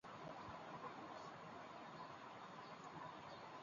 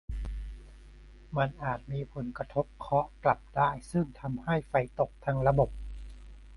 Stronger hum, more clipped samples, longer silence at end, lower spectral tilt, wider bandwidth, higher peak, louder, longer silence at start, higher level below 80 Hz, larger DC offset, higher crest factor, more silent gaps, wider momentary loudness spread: neither; neither; about the same, 0 s vs 0 s; second, -3.5 dB/octave vs -8 dB/octave; second, 7.2 kHz vs 11.5 kHz; second, -40 dBFS vs -10 dBFS; second, -55 LUFS vs -31 LUFS; about the same, 0.05 s vs 0.1 s; second, -82 dBFS vs -44 dBFS; neither; second, 16 dB vs 22 dB; neither; second, 2 LU vs 17 LU